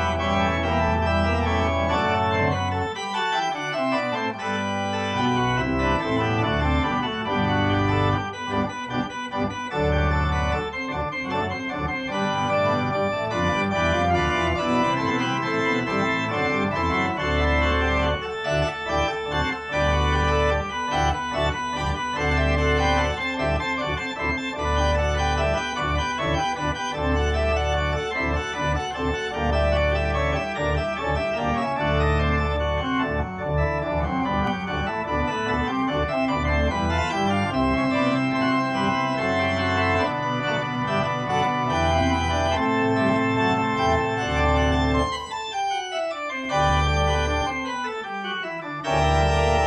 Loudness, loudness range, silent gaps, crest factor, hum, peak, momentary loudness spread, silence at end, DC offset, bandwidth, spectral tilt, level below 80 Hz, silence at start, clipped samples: -23 LUFS; 2 LU; none; 16 dB; none; -8 dBFS; 5 LU; 0 s; under 0.1%; 10 kHz; -5.5 dB/octave; -32 dBFS; 0 s; under 0.1%